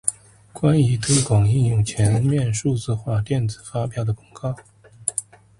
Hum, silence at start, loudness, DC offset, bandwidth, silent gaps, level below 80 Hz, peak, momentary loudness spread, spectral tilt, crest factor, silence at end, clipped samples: none; 0.05 s; -21 LUFS; under 0.1%; 11.5 kHz; none; -44 dBFS; 0 dBFS; 11 LU; -5.5 dB/octave; 20 dB; 0.4 s; under 0.1%